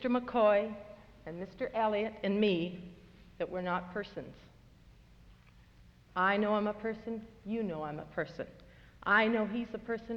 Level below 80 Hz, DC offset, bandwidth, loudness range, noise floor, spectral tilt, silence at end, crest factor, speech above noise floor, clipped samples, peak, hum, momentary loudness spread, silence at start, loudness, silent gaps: -62 dBFS; under 0.1%; 6.8 kHz; 7 LU; -60 dBFS; -7.5 dB/octave; 0 s; 20 dB; 27 dB; under 0.1%; -14 dBFS; none; 19 LU; 0 s; -33 LUFS; none